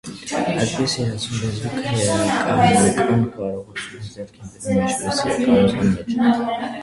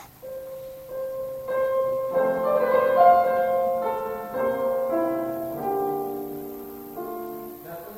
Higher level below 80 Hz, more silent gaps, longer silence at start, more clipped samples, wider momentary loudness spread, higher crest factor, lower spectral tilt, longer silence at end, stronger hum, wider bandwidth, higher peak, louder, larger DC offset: first, -46 dBFS vs -60 dBFS; neither; about the same, 0.05 s vs 0 s; neither; second, 15 LU vs 18 LU; about the same, 18 dB vs 20 dB; about the same, -5 dB/octave vs -6 dB/octave; about the same, 0 s vs 0 s; neither; second, 11.5 kHz vs 16.5 kHz; first, -2 dBFS vs -6 dBFS; first, -19 LUFS vs -24 LUFS; neither